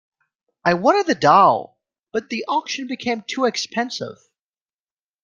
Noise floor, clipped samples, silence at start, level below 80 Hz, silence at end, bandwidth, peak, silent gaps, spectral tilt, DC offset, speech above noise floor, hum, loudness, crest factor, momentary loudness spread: under -90 dBFS; under 0.1%; 0.65 s; -64 dBFS; 1.1 s; 10 kHz; -2 dBFS; 2.03-2.07 s; -4 dB/octave; under 0.1%; over 71 dB; none; -19 LUFS; 20 dB; 14 LU